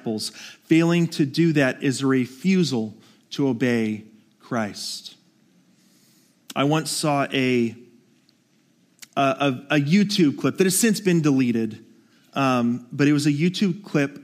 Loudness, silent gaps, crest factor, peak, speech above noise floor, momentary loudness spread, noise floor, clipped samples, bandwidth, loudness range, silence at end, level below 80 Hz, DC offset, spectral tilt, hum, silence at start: -22 LUFS; none; 18 dB; -6 dBFS; 41 dB; 12 LU; -62 dBFS; under 0.1%; 15.5 kHz; 7 LU; 0 s; -70 dBFS; under 0.1%; -5 dB/octave; none; 0.05 s